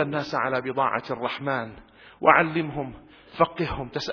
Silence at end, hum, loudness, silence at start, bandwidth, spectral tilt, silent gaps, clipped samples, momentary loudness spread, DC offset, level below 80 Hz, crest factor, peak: 0 s; none; -25 LUFS; 0 s; 5.4 kHz; -6.5 dB/octave; none; under 0.1%; 14 LU; under 0.1%; -52 dBFS; 24 dB; 0 dBFS